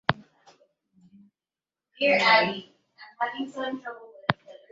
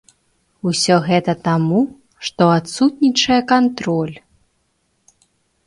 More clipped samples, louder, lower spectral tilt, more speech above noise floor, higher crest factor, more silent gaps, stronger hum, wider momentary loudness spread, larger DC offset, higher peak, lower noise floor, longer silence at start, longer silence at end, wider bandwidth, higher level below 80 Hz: neither; second, -25 LUFS vs -17 LUFS; about the same, -5 dB/octave vs -5 dB/octave; first, over 65 dB vs 50 dB; first, 28 dB vs 18 dB; neither; neither; first, 19 LU vs 10 LU; neither; about the same, -2 dBFS vs 0 dBFS; first, under -90 dBFS vs -66 dBFS; second, 0.1 s vs 0.65 s; second, 0.2 s vs 1.5 s; second, 7.8 kHz vs 11.5 kHz; second, -66 dBFS vs -56 dBFS